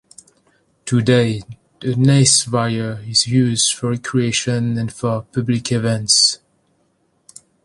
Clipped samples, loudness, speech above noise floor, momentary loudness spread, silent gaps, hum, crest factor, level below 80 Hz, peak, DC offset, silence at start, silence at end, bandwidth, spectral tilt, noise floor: under 0.1%; -16 LUFS; 46 dB; 11 LU; none; none; 18 dB; -52 dBFS; 0 dBFS; under 0.1%; 0.85 s; 1.3 s; 11.5 kHz; -4 dB/octave; -63 dBFS